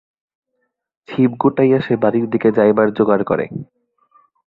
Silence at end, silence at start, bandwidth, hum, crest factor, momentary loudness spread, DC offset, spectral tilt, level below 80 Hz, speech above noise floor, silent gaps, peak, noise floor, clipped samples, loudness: 0.85 s; 1.1 s; 5.2 kHz; none; 16 dB; 9 LU; under 0.1%; -10.5 dB/octave; -56 dBFS; 56 dB; none; -2 dBFS; -72 dBFS; under 0.1%; -16 LUFS